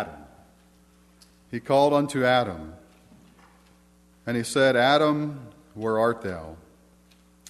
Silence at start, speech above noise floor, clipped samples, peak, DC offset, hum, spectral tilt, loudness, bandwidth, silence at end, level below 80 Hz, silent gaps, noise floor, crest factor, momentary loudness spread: 0 s; 34 dB; under 0.1%; -6 dBFS; under 0.1%; 60 Hz at -55 dBFS; -5 dB/octave; -23 LUFS; 13 kHz; 0.95 s; -58 dBFS; none; -58 dBFS; 20 dB; 20 LU